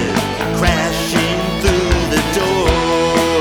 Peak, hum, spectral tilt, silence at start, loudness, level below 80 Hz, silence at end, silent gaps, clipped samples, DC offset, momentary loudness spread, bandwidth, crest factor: -2 dBFS; none; -4.5 dB/octave; 0 s; -15 LUFS; -24 dBFS; 0 s; none; under 0.1%; under 0.1%; 3 LU; over 20 kHz; 12 dB